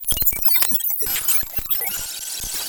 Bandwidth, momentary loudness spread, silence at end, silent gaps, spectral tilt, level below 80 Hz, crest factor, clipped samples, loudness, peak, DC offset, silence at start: 19.5 kHz; 11 LU; 0 s; none; 0 dB/octave; -40 dBFS; 20 dB; under 0.1%; -17 LUFS; 0 dBFS; under 0.1%; 0 s